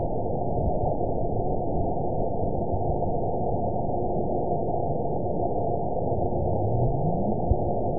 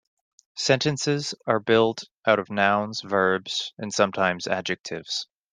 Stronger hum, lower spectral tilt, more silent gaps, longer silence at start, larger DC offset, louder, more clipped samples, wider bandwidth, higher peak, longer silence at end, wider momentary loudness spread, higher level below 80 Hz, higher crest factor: neither; first, -18.5 dB/octave vs -4 dB/octave; second, none vs 2.16-2.21 s, 4.80-4.84 s; second, 0 s vs 0.55 s; first, 3% vs under 0.1%; second, -27 LUFS vs -24 LUFS; neither; second, 1 kHz vs 10 kHz; second, -10 dBFS vs -4 dBFS; second, 0 s vs 0.3 s; second, 2 LU vs 8 LU; first, -36 dBFS vs -66 dBFS; second, 16 dB vs 22 dB